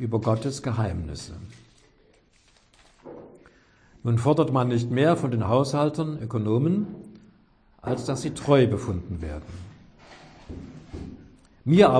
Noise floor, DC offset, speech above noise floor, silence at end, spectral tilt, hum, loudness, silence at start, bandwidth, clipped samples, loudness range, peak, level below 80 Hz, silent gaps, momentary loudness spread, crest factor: -60 dBFS; under 0.1%; 37 dB; 0 s; -7 dB/octave; none; -25 LUFS; 0 s; 10.5 kHz; under 0.1%; 11 LU; -4 dBFS; -48 dBFS; none; 21 LU; 22 dB